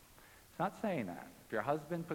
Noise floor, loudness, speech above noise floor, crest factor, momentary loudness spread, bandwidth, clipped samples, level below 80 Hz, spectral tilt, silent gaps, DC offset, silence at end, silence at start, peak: -61 dBFS; -40 LUFS; 22 dB; 20 dB; 18 LU; 17.5 kHz; under 0.1%; -70 dBFS; -6.5 dB/octave; none; under 0.1%; 0 s; 0 s; -20 dBFS